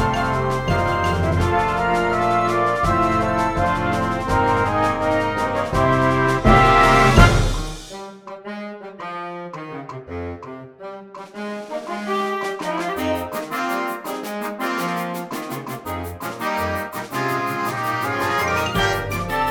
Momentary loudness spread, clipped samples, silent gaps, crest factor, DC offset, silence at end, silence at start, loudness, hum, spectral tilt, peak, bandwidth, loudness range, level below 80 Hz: 17 LU; under 0.1%; none; 20 dB; under 0.1%; 0 s; 0 s; -20 LUFS; none; -5.5 dB/octave; 0 dBFS; over 20 kHz; 14 LU; -32 dBFS